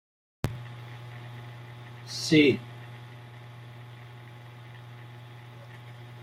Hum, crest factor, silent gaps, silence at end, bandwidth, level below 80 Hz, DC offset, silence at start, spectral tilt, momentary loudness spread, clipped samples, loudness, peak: none; 24 dB; none; 0 s; 15.5 kHz; -60 dBFS; under 0.1%; 0.45 s; -5.5 dB/octave; 23 LU; under 0.1%; -26 LUFS; -8 dBFS